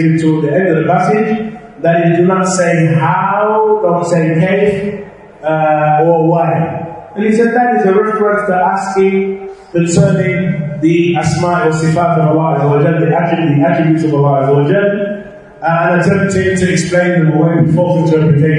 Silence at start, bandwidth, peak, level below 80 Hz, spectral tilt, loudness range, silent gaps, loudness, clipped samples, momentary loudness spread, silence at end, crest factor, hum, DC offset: 0 s; 10.5 kHz; 0 dBFS; -48 dBFS; -7 dB/octave; 1 LU; none; -12 LUFS; under 0.1%; 7 LU; 0 s; 12 dB; none; under 0.1%